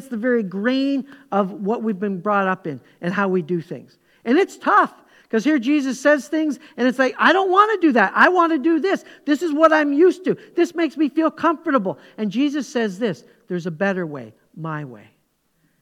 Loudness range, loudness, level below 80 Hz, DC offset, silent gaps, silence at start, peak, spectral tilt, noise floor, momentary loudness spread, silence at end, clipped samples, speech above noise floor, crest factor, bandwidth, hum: 7 LU; -19 LUFS; -72 dBFS; under 0.1%; none; 0 s; 0 dBFS; -6 dB/octave; -66 dBFS; 14 LU; 0.85 s; under 0.1%; 47 dB; 20 dB; 13 kHz; none